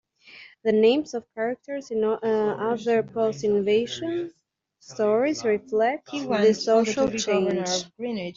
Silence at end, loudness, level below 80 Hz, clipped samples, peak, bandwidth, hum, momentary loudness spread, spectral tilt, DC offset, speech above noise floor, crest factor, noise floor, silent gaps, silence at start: 0.05 s; -24 LUFS; -64 dBFS; under 0.1%; -8 dBFS; 7.6 kHz; none; 10 LU; -4.5 dB/octave; under 0.1%; 25 dB; 16 dB; -49 dBFS; none; 0.3 s